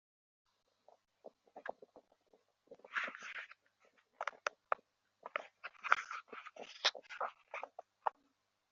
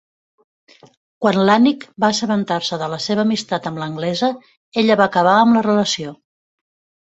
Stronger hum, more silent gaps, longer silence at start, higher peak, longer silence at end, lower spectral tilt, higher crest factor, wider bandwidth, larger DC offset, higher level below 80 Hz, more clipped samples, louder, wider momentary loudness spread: neither; second, none vs 4.57-4.72 s; about the same, 1.25 s vs 1.2 s; second, -10 dBFS vs -2 dBFS; second, 0.6 s vs 0.95 s; second, 4 dB/octave vs -5 dB/octave; first, 36 dB vs 16 dB; second, 7.4 kHz vs 8.2 kHz; neither; second, under -90 dBFS vs -60 dBFS; neither; second, -42 LUFS vs -17 LUFS; first, 20 LU vs 11 LU